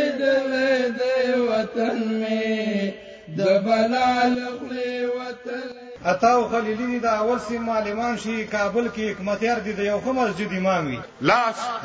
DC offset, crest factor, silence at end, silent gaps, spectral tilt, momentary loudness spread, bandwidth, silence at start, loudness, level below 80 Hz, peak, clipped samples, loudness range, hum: under 0.1%; 18 dB; 0 s; none; -5.5 dB/octave; 9 LU; 8 kHz; 0 s; -23 LUFS; -56 dBFS; -4 dBFS; under 0.1%; 2 LU; none